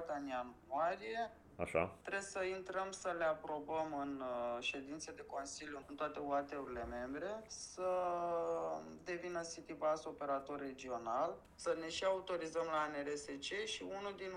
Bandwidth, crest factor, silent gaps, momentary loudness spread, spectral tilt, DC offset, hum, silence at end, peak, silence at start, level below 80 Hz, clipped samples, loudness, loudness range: 12 kHz; 20 dB; none; 8 LU; -3.5 dB/octave; under 0.1%; none; 0 s; -22 dBFS; 0 s; -68 dBFS; under 0.1%; -42 LUFS; 2 LU